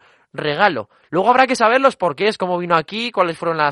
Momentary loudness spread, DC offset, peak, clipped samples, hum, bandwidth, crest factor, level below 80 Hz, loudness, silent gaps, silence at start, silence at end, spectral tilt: 10 LU; under 0.1%; 0 dBFS; under 0.1%; none; 11.5 kHz; 18 dB; -62 dBFS; -17 LUFS; none; 0.35 s; 0 s; -4.5 dB/octave